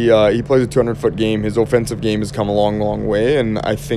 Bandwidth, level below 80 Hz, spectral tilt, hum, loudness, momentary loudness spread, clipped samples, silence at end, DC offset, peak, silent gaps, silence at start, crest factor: 14 kHz; -36 dBFS; -6.5 dB/octave; none; -17 LUFS; 6 LU; under 0.1%; 0 s; under 0.1%; 0 dBFS; none; 0 s; 16 dB